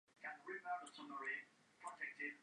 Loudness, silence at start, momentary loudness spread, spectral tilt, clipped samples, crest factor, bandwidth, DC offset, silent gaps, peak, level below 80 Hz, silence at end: -49 LUFS; 0.2 s; 9 LU; -2.5 dB/octave; under 0.1%; 16 dB; 11 kHz; under 0.1%; none; -34 dBFS; under -90 dBFS; 0 s